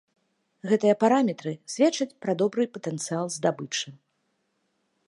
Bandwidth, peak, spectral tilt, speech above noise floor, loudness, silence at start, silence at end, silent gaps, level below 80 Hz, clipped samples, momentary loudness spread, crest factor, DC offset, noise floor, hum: 11.5 kHz; -8 dBFS; -4.5 dB/octave; 49 dB; -26 LUFS; 0.65 s; 1.1 s; none; -80 dBFS; under 0.1%; 12 LU; 20 dB; under 0.1%; -74 dBFS; none